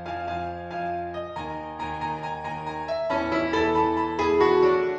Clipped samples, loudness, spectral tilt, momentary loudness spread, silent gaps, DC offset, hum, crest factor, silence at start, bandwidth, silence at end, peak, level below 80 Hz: under 0.1%; -26 LUFS; -6.5 dB/octave; 13 LU; none; under 0.1%; none; 18 dB; 0 s; 8 kHz; 0 s; -8 dBFS; -50 dBFS